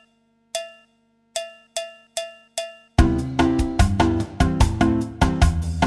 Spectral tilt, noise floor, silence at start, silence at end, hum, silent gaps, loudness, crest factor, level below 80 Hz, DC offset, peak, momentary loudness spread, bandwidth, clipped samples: -6 dB/octave; -63 dBFS; 0.55 s; 0 s; 50 Hz at -45 dBFS; none; -22 LUFS; 18 dB; -26 dBFS; under 0.1%; -4 dBFS; 12 LU; 13 kHz; under 0.1%